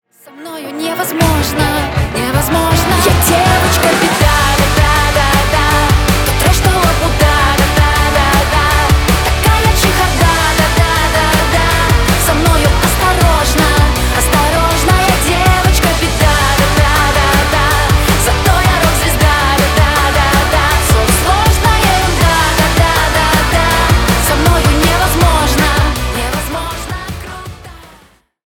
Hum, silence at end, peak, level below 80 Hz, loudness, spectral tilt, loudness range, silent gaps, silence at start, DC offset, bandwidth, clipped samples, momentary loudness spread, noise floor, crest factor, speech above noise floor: none; 0.6 s; 0 dBFS; -16 dBFS; -11 LUFS; -4 dB/octave; 1 LU; none; 0.35 s; under 0.1%; 20 kHz; under 0.1%; 4 LU; -46 dBFS; 10 dB; 34 dB